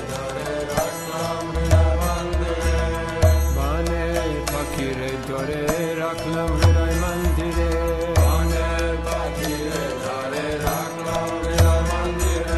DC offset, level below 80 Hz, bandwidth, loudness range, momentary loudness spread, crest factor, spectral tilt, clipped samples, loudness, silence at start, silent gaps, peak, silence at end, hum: 0.1%; -26 dBFS; 13 kHz; 2 LU; 8 LU; 18 dB; -5.5 dB/octave; under 0.1%; -22 LUFS; 0 s; none; -4 dBFS; 0 s; none